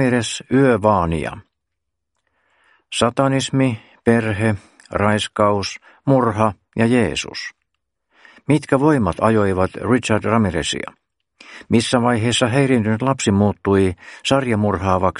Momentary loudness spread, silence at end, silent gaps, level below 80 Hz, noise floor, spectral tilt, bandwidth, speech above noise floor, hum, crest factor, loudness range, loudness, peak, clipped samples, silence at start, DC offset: 9 LU; 0 s; none; -46 dBFS; -79 dBFS; -5.5 dB/octave; 11.5 kHz; 62 dB; none; 18 dB; 3 LU; -18 LUFS; 0 dBFS; under 0.1%; 0 s; under 0.1%